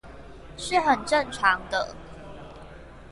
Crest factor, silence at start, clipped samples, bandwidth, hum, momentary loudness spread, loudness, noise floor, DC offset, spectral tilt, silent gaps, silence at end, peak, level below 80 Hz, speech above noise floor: 22 dB; 0.05 s; under 0.1%; 11.5 kHz; none; 24 LU; -25 LUFS; -44 dBFS; under 0.1%; -3 dB/octave; none; 0.05 s; -6 dBFS; -48 dBFS; 20 dB